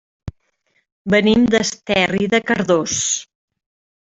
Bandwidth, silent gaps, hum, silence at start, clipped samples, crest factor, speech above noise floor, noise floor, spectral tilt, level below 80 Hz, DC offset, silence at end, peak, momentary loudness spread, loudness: 8.2 kHz; 0.92-1.05 s; none; 0.25 s; under 0.1%; 16 dB; 49 dB; -66 dBFS; -3.5 dB/octave; -48 dBFS; under 0.1%; 0.85 s; -2 dBFS; 20 LU; -17 LUFS